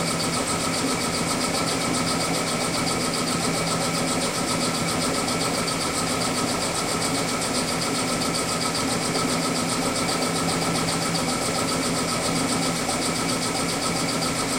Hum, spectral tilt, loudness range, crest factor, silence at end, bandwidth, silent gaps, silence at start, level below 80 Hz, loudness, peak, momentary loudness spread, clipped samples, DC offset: none; -3 dB/octave; 0 LU; 14 dB; 0 s; 16 kHz; none; 0 s; -48 dBFS; -23 LUFS; -10 dBFS; 1 LU; under 0.1%; under 0.1%